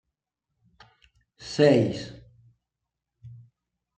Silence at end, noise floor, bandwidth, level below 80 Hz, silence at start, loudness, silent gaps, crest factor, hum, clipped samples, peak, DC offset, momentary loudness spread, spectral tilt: 0.7 s; -85 dBFS; 9.2 kHz; -64 dBFS; 1.4 s; -23 LUFS; none; 24 dB; none; under 0.1%; -6 dBFS; under 0.1%; 23 LU; -6.5 dB/octave